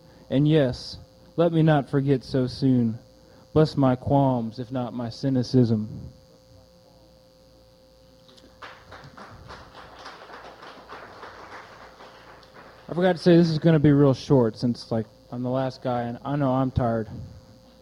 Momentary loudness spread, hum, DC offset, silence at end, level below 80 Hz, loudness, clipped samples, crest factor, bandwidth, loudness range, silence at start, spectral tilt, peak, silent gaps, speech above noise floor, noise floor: 24 LU; none; under 0.1%; 0.45 s; -52 dBFS; -23 LUFS; under 0.1%; 18 dB; 11 kHz; 22 LU; 0.3 s; -8.5 dB/octave; -6 dBFS; none; 32 dB; -54 dBFS